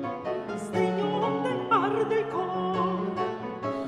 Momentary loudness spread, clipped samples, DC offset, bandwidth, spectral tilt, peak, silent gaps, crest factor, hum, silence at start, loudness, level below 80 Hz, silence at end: 8 LU; under 0.1%; under 0.1%; 11.5 kHz; -6.5 dB/octave; -10 dBFS; none; 16 dB; none; 0 s; -28 LUFS; -66 dBFS; 0 s